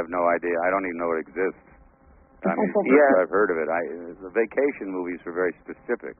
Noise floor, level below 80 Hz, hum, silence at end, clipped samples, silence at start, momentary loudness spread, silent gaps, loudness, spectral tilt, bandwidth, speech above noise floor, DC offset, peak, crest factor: -54 dBFS; -60 dBFS; none; 0.05 s; under 0.1%; 0 s; 13 LU; none; -24 LUFS; -0.5 dB/octave; 3.3 kHz; 31 dB; under 0.1%; -6 dBFS; 20 dB